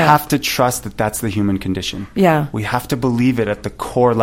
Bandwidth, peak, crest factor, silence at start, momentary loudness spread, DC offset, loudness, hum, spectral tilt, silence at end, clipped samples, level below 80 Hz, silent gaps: 16.5 kHz; 0 dBFS; 16 dB; 0 s; 7 LU; under 0.1%; -18 LUFS; none; -5.5 dB/octave; 0 s; under 0.1%; -42 dBFS; none